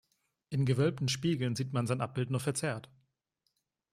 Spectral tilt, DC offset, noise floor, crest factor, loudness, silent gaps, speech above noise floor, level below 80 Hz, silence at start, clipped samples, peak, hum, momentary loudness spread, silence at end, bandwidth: -5.5 dB/octave; under 0.1%; -82 dBFS; 18 dB; -33 LUFS; none; 50 dB; -66 dBFS; 0.5 s; under 0.1%; -16 dBFS; none; 7 LU; 1.1 s; 14.5 kHz